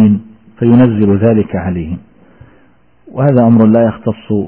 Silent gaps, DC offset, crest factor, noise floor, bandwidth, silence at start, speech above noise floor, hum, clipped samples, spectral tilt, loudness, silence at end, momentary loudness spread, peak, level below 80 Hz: none; under 0.1%; 12 dB; -50 dBFS; 3.3 kHz; 0 s; 40 dB; none; under 0.1%; -14.5 dB/octave; -11 LUFS; 0 s; 13 LU; 0 dBFS; -40 dBFS